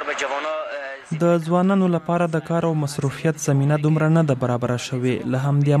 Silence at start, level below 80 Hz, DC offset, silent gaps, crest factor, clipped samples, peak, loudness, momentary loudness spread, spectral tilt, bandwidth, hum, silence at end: 0 s; -60 dBFS; under 0.1%; none; 14 dB; under 0.1%; -6 dBFS; -21 LUFS; 7 LU; -7 dB/octave; 13.5 kHz; none; 0 s